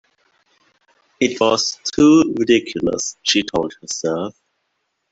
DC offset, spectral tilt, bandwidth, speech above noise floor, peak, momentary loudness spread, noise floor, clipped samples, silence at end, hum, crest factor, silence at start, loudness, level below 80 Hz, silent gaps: under 0.1%; -3.5 dB/octave; 8 kHz; 55 dB; -2 dBFS; 11 LU; -72 dBFS; under 0.1%; 0.8 s; none; 18 dB; 1.2 s; -17 LUFS; -52 dBFS; none